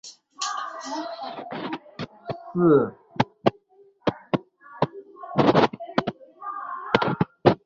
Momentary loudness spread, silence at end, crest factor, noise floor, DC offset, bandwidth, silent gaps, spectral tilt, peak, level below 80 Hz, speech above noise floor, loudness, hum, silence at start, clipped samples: 16 LU; 0.1 s; 26 dB; -57 dBFS; under 0.1%; 8 kHz; none; -6 dB/octave; 0 dBFS; -58 dBFS; 33 dB; -25 LUFS; none; 0.05 s; under 0.1%